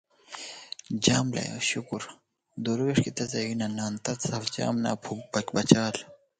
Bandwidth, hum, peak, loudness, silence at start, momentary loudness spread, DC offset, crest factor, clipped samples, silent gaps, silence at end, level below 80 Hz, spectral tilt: 9.6 kHz; none; 0 dBFS; -28 LUFS; 0.3 s; 16 LU; under 0.1%; 28 dB; under 0.1%; none; 0.25 s; -62 dBFS; -4.5 dB/octave